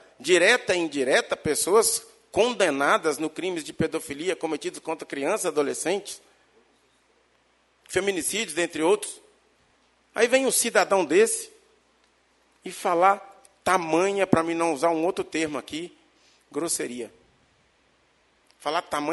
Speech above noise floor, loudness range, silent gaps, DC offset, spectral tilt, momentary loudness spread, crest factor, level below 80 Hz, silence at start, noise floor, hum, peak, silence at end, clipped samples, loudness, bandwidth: 41 dB; 7 LU; none; under 0.1%; -3 dB/octave; 14 LU; 24 dB; -62 dBFS; 0.2 s; -65 dBFS; none; -2 dBFS; 0 s; under 0.1%; -24 LUFS; 12 kHz